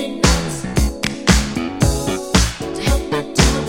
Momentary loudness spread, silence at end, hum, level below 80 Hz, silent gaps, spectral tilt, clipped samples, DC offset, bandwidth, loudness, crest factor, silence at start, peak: 6 LU; 0 s; none; -22 dBFS; none; -4.5 dB/octave; under 0.1%; under 0.1%; 16.5 kHz; -18 LUFS; 18 dB; 0 s; 0 dBFS